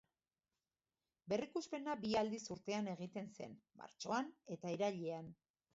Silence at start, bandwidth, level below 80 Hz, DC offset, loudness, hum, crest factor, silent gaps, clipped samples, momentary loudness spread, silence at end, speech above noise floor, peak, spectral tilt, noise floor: 1.25 s; 7.6 kHz; -80 dBFS; under 0.1%; -44 LUFS; none; 18 dB; none; under 0.1%; 14 LU; 0.4 s; over 46 dB; -26 dBFS; -4.5 dB/octave; under -90 dBFS